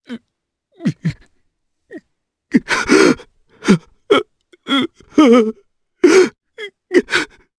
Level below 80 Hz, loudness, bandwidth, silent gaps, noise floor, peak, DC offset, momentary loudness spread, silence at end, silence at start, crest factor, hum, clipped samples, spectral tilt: -52 dBFS; -15 LUFS; 11 kHz; none; -74 dBFS; 0 dBFS; under 0.1%; 19 LU; 0.35 s; 0.1 s; 16 dB; none; under 0.1%; -5 dB/octave